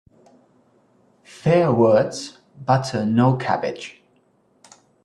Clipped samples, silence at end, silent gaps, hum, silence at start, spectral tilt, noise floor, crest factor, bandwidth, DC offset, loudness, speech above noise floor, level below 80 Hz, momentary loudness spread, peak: under 0.1%; 1.15 s; none; none; 1.45 s; -7 dB/octave; -61 dBFS; 18 dB; 11 kHz; under 0.1%; -19 LUFS; 42 dB; -60 dBFS; 18 LU; -4 dBFS